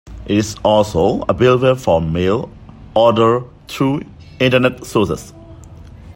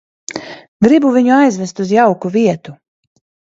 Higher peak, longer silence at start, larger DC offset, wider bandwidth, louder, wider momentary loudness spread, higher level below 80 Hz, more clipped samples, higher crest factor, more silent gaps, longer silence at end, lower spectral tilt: about the same, 0 dBFS vs 0 dBFS; second, 0.05 s vs 0.3 s; neither; first, 16.5 kHz vs 8 kHz; second, -16 LUFS vs -12 LUFS; second, 9 LU vs 17 LU; first, -40 dBFS vs -56 dBFS; neither; about the same, 16 dB vs 14 dB; second, none vs 0.68-0.80 s; second, 0.05 s vs 0.7 s; about the same, -6 dB/octave vs -6 dB/octave